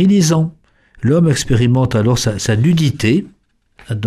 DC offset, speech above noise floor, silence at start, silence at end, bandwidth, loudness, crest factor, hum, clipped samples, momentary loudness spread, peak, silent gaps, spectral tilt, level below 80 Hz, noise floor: under 0.1%; 36 dB; 0 s; 0 s; 14.5 kHz; -14 LUFS; 12 dB; none; under 0.1%; 6 LU; -2 dBFS; none; -6 dB/octave; -38 dBFS; -49 dBFS